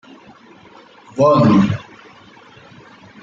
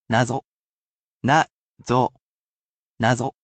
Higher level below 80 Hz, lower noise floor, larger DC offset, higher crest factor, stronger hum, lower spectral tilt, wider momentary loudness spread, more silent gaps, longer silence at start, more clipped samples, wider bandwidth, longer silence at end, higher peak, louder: about the same, -54 dBFS vs -58 dBFS; second, -44 dBFS vs under -90 dBFS; neither; about the same, 16 dB vs 20 dB; neither; first, -8 dB/octave vs -5.5 dB/octave; first, 16 LU vs 9 LU; second, none vs 0.45-1.20 s, 1.51-1.75 s, 2.21-2.96 s; first, 1.15 s vs 0.1 s; neither; second, 7.6 kHz vs 9 kHz; first, 1.4 s vs 0.15 s; about the same, -2 dBFS vs -4 dBFS; first, -14 LUFS vs -22 LUFS